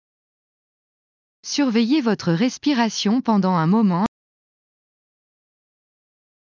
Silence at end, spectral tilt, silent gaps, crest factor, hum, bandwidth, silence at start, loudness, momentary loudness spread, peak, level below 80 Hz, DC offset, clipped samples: 2.35 s; -5.5 dB/octave; none; 16 dB; none; 7.6 kHz; 1.45 s; -20 LUFS; 6 LU; -6 dBFS; -64 dBFS; under 0.1%; under 0.1%